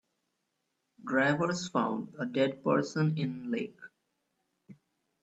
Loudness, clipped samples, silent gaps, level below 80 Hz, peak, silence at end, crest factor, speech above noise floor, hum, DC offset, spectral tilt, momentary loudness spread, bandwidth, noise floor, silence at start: -31 LUFS; under 0.1%; none; -76 dBFS; -14 dBFS; 0.5 s; 18 dB; 51 dB; none; under 0.1%; -6 dB/octave; 8 LU; 8.2 kHz; -82 dBFS; 1.05 s